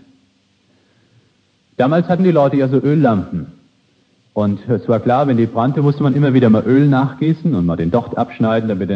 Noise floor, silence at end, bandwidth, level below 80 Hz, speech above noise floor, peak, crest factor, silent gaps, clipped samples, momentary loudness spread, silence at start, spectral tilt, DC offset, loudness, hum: -58 dBFS; 0 s; 6.2 kHz; -50 dBFS; 44 dB; 0 dBFS; 14 dB; none; under 0.1%; 8 LU; 1.8 s; -10 dB/octave; under 0.1%; -15 LUFS; none